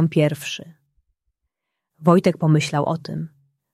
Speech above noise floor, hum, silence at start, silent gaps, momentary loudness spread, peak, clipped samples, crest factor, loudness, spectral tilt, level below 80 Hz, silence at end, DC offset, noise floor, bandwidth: 61 dB; none; 0 s; none; 15 LU; -2 dBFS; under 0.1%; 20 dB; -20 LUFS; -6.5 dB/octave; -62 dBFS; 0.45 s; under 0.1%; -80 dBFS; 13.5 kHz